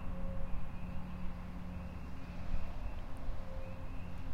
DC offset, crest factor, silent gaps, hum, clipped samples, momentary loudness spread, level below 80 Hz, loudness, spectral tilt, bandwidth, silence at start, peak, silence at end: under 0.1%; 14 dB; none; none; under 0.1%; 3 LU; -42 dBFS; -46 LUFS; -7.5 dB/octave; 5.6 kHz; 0 s; -22 dBFS; 0 s